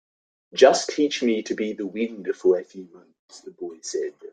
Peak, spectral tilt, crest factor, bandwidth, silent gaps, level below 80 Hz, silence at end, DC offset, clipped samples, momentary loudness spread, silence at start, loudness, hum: -2 dBFS; -3.5 dB/octave; 22 dB; 9.4 kHz; 3.19-3.28 s; -70 dBFS; 0.05 s; under 0.1%; under 0.1%; 20 LU; 0.55 s; -23 LUFS; none